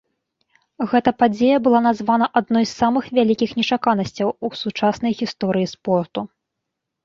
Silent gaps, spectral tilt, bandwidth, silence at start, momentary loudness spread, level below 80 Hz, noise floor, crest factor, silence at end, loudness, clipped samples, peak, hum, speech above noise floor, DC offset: none; -6 dB/octave; 7.4 kHz; 0.8 s; 8 LU; -58 dBFS; -80 dBFS; 18 dB; 0.8 s; -19 LUFS; under 0.1%; -2 dBFS; none; 61 dB; under 0.1%